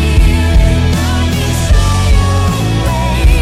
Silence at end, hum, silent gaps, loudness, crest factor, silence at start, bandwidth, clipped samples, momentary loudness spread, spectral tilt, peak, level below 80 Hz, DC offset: 0 s; none; none; -12 LUFS; 10 dB; 0 s; 15.5 kHz; under 0.1%; 3 LU; -5.5 dB/octave; 0 dBFS; -12 dBFS; under 0.1%